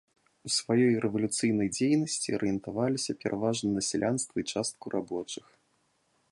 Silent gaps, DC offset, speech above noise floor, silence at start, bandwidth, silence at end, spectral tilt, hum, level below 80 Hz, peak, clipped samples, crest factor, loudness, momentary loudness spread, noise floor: none; under 0.1%; 43 dB; 0.45 s; 11.5 kHz; 0.95 s; -4.5 dB/octave; none; -64 dBFS; -14 dBFS; under 0.1%; 16 dB; -29 LUFS; 9 LU; -72 dBFS